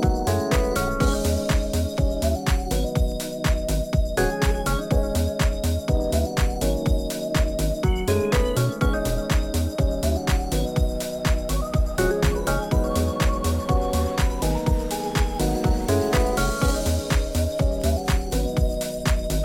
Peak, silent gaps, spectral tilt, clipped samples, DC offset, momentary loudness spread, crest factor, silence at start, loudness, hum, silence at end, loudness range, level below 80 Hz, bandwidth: -8 dBFS; none; -5.5 dB/octave; under 0.1%; under 0.1%; 3 LU; 14 dB; 0 s; -24 LUFS; none; 0 s; 1 LU; -26 dBFS; 17 kHz